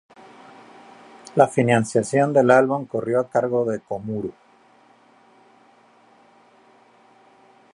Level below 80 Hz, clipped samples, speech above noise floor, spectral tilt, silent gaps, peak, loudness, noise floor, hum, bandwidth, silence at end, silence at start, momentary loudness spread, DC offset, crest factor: -64 dBFS; under 0.1%; 35 dB; -6.5 dB/octave; none; -2 dBFS; -20 LUFS; -55 dBFS; none; 11.5 kHz; 3.4 s; 1.35 s; 13 LU; under 0.1%; 22 dB